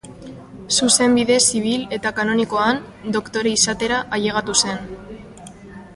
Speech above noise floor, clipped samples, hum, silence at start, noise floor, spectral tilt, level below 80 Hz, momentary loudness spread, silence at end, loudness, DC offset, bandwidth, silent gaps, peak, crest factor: 20 dB; under 0.1%; none; 0.05 s; -39 dBFS; -2.5 dB/octave; -50 dBFS; 23 LU; 0 s; -18 LUFS; under 0.1%; 11.5 kHz; none; 0 dBFS; 20 dB